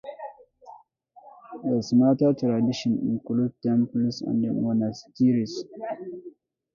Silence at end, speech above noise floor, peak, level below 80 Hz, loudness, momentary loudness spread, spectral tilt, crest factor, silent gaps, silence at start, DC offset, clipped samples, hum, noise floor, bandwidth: 0.45 s; 31 dB; -10 dBFS; -64 dBFS; -25 LUFS; 18 LU; -7.5 dB/octave; 16 dB; none; 0.05 s; under 0.1%; under 0.1%; none; -55 dBFS; 7.2 kHz